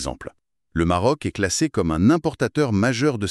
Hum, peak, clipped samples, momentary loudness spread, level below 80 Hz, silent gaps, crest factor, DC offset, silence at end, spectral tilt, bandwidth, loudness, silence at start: none; -6 dBFS; under 0.1%; 12 LU; -42 dBFS; none; 16 dB; under 0.1%; 0 s; -5.5 dB/octave; 13 kHz; -21 LUFS; 0 s